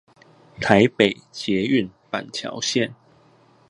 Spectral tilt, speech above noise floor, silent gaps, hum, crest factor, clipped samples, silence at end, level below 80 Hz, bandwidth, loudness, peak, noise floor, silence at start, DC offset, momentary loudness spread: -4.5 dB/octave; 35 dB; none; none; 22 dB; under 0.1%; 0.75 s; -56 dBFS; 11.5 kHz; -22 LUFS; 0 dBFS; -55 dBFS; 0.6 s; under 0.1%; 13 LU